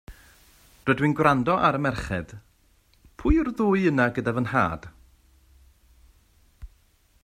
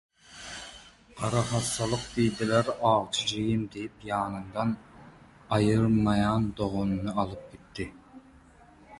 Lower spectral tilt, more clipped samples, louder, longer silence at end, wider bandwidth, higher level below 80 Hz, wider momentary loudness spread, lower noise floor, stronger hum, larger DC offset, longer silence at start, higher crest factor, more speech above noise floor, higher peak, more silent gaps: first, -7.5 dB/octave vs -5.5 dB/octave; neither; first, -24 LUFS vs -28 LUFS; first, 0.6 s vs 0 s; first, 15.5 kHz vs 11.5 kHz; first, -42 dBFS vs -50 dBFS; second, 11 LU vs 16 LU; first, -62 dBFS vs -55 dBFS; neither; neither; second, 0.1 s vs 0.3 s; about the same, 22 dB vs 20 dB; first, 39 dB vs 28 dB; first, -4 dBFS vs -10 dBFS; neither